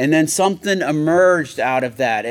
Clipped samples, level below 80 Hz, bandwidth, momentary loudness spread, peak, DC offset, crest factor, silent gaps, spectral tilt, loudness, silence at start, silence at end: under 0.1%; -64 dBFS; 17.5 kHz; 5 LU; -4 dBFS; under 0.1%; 14 dB; none; -4.5 dB/octave; -17 LUFS; 0 s; 0 s